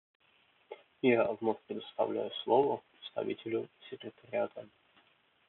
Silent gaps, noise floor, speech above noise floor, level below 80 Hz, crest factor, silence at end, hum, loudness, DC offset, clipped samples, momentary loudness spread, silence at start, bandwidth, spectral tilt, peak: none; -69 dBFS; 35 dB; -82 dBFS; 22 dB; 0.85 s; none; -34 LUFS; under 0.1%; under 0.1%; 18 LU; 0.7 s; 4.2 kHz; -3.5 dB/octave; -14 dBFS